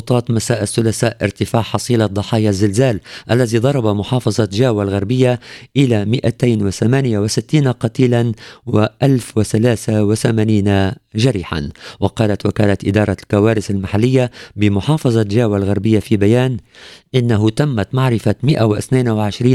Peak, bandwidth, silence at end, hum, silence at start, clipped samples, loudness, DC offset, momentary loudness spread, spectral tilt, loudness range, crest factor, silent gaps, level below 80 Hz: 0 dBFS; 13.5 kHz; 0 s; none; 0 s; under 0.1%; -16 LUFS; under 0.1%; 4 LU; -6.5 dB/octave; 1 LU; 14 dB; none; -44 dBFS